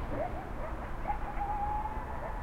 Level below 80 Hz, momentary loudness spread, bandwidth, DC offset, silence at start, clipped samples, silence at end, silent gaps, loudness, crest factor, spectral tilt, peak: -40 dBFS; 6 LU; 14 kHz; under 0.1%; 0 s; under 0.1%; 0 s; none; -38 LUFS; 14 dB; -7.5 dB/octave; -20 dBFS